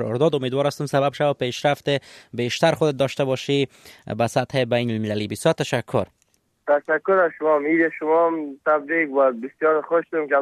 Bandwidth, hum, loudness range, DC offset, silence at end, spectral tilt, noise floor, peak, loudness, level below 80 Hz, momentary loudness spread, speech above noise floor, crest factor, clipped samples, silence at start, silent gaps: 14 kHz; none; 3 LU; under 0.1%; 0 s; -5.5 dB/octave; -66 dBFS; -4 dBFS; -22 LUFS; -62 dBFS; 7 LU; 45 dB; 18 dB; under 0.1%; 0 s; none